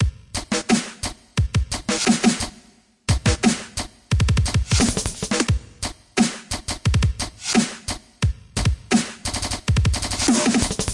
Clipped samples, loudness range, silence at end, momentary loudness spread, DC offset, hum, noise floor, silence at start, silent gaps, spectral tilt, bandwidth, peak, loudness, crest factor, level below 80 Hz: under 0.1%; 2 LU; 0 s; 11 LU; under 0.1%; none; -53 dBFS; 0 s; none; -4 dB/octave; 11.5 kHz; -6 dBFS; -22 LUFS; 16 dB; -30 dBFS